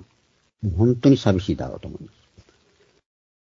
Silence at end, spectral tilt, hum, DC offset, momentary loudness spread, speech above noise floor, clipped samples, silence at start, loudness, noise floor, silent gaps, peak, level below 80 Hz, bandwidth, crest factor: 1.4 s; -8 dB/octave; none; under 0.1%; 20 LU; 44 dB; under 0.1%; 0.65 s; -21 LUFS; -64 dBFS; none; -2 dBFS; -44 dBFS; 7.4 kHz; 20 dB